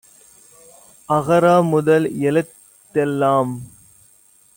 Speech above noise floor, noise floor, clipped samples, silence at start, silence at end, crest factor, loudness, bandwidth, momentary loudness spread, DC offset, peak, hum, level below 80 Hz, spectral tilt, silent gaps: 37 dB; -53 dBFS; under 0.1%; 1.1 s; 0.9 s; 16 dB; -17 LUFS; 17 kHz; 11 LU; under 0.1%; -4 dBFS; none; -60 dBFS; -7 dB/octave; none